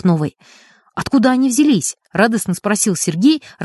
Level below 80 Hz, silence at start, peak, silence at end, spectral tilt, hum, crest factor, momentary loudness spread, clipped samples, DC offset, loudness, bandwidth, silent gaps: -52 dBFS; 0.05 s; -2 dBFS; 0 s; -4.5 dB/octave; none; 14 dB; 8 LU; under 0.1%; under 0.1%; -16 LUFS; 12 kHz; none